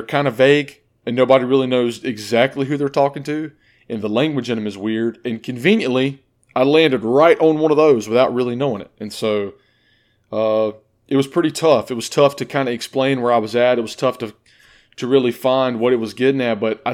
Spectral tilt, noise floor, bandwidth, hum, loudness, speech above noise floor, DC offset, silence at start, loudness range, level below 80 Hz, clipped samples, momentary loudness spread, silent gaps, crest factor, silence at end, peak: -5.5 dB/octave; -59 dBFS; 16 kHz; none; -18 LUFS; 42 dB; under 0.1%; 0 s; 5 LU; -64 dBFS; under 0.1%; 12 LU; none; 18 dB; 0 s; 0 dBFS